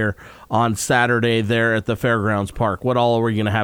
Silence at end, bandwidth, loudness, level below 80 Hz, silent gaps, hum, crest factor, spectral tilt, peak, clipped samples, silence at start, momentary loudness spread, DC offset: 0 s; 17 kHz; -19 LUFS; -46 dBFS; none; none; 14 dB; -5.5 dB/octave; -4 dBFS; under 0.1%; 0 s; 5 LU; under 0.1%